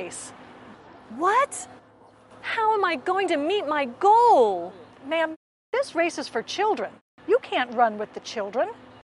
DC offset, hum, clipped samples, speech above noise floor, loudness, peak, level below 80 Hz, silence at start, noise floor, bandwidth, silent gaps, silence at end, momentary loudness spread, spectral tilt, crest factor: under 0.1%; none; under 0.1%; 30 dB; -24 LUFS; -8 dBFS; -70 dBFS; 0 s; -53 dBFS; 11.5 kHz; 5.36-5.73 s, 7.01-7.18 s; 0.3 s; 18 LU; -3 dB/octave; 18 dB